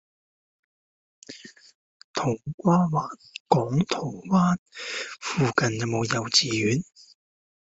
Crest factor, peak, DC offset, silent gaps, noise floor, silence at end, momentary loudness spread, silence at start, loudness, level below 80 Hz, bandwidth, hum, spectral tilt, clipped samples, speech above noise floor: 22 dB; -4 dBFS; under 0.1%; 1.75-2.14 s, 2.54-2.58 s, 3.40-3.46 s, 4.59-4.66 s; -46 dBFS; 0.85 s; 18 LU; 1.3 s; -25 LUFS; -60 dBFS; 8 kHz; none; -5 dB/octave; under 0.1%; 22 dB